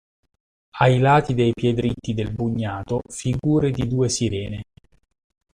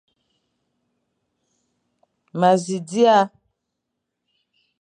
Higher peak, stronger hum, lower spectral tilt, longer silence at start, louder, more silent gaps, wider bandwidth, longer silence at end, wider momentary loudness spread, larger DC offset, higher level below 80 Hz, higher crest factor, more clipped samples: about the same, -4 dBFS vs -2 dBFS; neither; about the same, -6 dB/octave vs -5.5 dB/octave; second, 0.75 s vs 2.35 s; second, -21 LUFS vs -18 LUFS; neither; about the same, 10.5 kHz vs 10.5 kHz; second, 0.95 s vs 1.55 s; about the same, 10 LU vs 11 LU; neither; first, -46 dBFS vs -76 dBFS; about the same, 18 dB vs 20 dB; neither